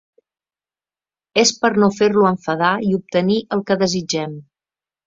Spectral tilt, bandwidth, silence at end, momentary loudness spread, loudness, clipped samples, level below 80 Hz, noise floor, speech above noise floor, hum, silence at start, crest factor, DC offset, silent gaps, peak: -4.5 dB/octave; 7.8 kHz; 0.65 s; 8 LU; -17 LUFS; under 0.1%; -60 dBFS; under -90 dBFS; over 73 dB; none; 1.35 s; 18 dB; under 0.1%; none; 0 dBFS